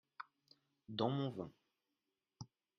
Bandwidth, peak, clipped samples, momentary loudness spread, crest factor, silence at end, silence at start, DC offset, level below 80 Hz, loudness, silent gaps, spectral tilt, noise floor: 6.6 kHz; -22 dBFS; under 0.1%; 19 LU; 24 dB; 0.35 s; 0.2 s; under 0.1%; -82 dBFS; -42 LUFS; none; -7 dB/octave; -90 dBFS